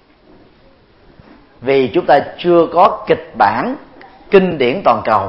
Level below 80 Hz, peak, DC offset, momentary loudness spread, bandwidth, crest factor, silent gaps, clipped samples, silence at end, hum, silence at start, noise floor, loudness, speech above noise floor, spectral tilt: -50 dBFS; 0 dBFS; under 0.1%; 8 LU; 5.8 kHz; 14 dB; none; under 0.1%; 0 s; none; 1.6 s; -48 dBFS; -13 LUFS; 35 dB; -8.5 dB/octave